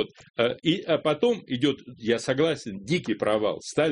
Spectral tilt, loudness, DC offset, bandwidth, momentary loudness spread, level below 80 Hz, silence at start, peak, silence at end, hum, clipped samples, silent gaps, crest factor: -5 dB/octave; -26 LUFS; under 0.1%; 10.5 kHz; 5 LU; -62 dBFS; 0 s; -8 dBFS; 0 s; none; under 0.1%; 0.30-0.34 s; 18 dB